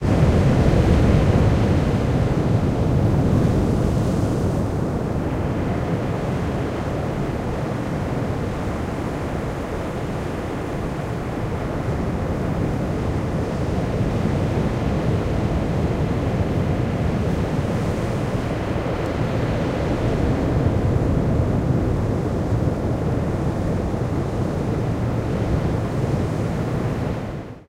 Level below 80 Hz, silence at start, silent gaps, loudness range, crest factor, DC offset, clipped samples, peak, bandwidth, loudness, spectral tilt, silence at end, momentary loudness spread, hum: -30 dBFS; 0 s; none; 6 LU; 18 dB; under 0.1%; under 0.1%; -4 dBFS; 15 kHz; -22 LUFS; -8 dB/octave; 0.05 s; 8 LU; none